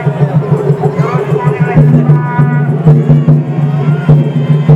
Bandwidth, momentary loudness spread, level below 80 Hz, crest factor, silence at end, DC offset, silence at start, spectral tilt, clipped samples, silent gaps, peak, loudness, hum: 3.8 kHz; 5 LU; -34 dBFS; 8 dB; 0 s; under 0.1%; 0 s; -10 dB/octave; 1%; none; 0 dBFS; -9 LUFS; none